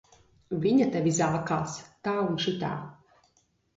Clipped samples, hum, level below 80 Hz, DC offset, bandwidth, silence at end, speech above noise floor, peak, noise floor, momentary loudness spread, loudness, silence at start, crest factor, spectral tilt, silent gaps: under 0.1%; none; -62 dBFS; under 0.1%; 8 kHz; 0.85 s; 42 dB; -12 dBFS; -69 dBFS; 12 LU; -28 LUFS; 0.5 s; 16 dB; -5.5 dB/octave; none